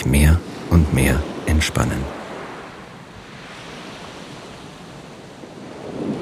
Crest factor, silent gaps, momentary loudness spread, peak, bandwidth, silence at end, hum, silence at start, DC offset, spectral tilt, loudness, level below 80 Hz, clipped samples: 20 dB; none; 21 LU; -2 dBFS; 15.5 kHz; 0 s; none; 0 s; under 0.1%; -5.5 dB/octave; -20 LUFS; -26 dBFS; under 0.1%